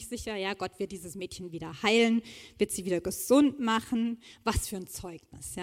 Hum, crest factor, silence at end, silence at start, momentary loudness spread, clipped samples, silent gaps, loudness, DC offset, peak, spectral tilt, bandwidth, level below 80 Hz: none; 20 dB; 0 s; 0 s; 17 LU; under 0.1%; none; -30 LUFS; under 0.1%; -10 dBFS; -4 dB/octave; 16.5 kHz; -50 dBFS